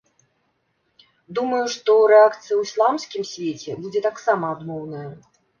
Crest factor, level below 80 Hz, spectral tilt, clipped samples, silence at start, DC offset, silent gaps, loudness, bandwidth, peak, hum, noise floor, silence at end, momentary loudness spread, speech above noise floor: 20 dB; -70 dBFS; -4.5 dB/octave; under 0.1%; 1.3 s; under 0.1%; none; -20 LUFS; 7.2 kHz; -2 dBFS; none; -69 dBFS; 0.4 s; 18 LU; 49 dB